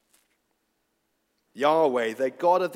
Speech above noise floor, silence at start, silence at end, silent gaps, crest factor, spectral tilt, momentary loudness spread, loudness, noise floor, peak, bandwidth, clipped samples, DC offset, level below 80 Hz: 52 dB; 1.55 s; 0 s; none; 18 dB; -5 dB/octave; 5 LU; -24 LUFS; -75 dBFS; -8 dBFS; 15.5 kHz; under 0.1%; under 0.1%; -86 dBFS